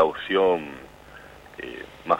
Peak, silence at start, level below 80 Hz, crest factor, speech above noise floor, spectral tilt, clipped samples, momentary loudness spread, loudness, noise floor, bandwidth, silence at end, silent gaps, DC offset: -6 dBFS; 0 s; -56 dBFS; 20 dB; 21 dB; -5.5 dB/octave; under 0.1%; 24 LU; -24 LUFS; -46 dBFS; 15.5 kHz; 0 s; none; under 0.1%